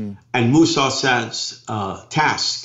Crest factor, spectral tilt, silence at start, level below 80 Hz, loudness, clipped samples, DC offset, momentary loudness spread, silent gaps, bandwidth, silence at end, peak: 14 dB; -4 dB/octave; 0 s; -56 dBFS; -19 LUFS; under 0.1%; under 0.1%; 11 LU; none; 8 kHz; 0 s; -6 dBFS